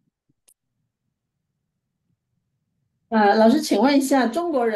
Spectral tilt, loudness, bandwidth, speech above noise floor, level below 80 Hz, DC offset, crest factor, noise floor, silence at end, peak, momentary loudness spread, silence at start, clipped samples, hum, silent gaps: -4.5 dB/octave; -18 LUFS; 12.5 kHz; 61 dB; -72 dBFS; under 0.1%; 16 dB; -78 dBFS; 0 s; -6 dBFS; 7 LU; 3.1 s; under 0.1%; none; none